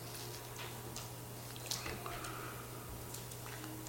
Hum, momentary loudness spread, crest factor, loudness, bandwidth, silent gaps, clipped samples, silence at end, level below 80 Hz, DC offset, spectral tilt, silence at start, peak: none; 6 LU; 26 dB; -45 LUFS; 17 kHz; none; under 0.1%; 0 s; -60 dBFS; under 0.1%; -3.5 dB/octave; 0 s; -20 dBFS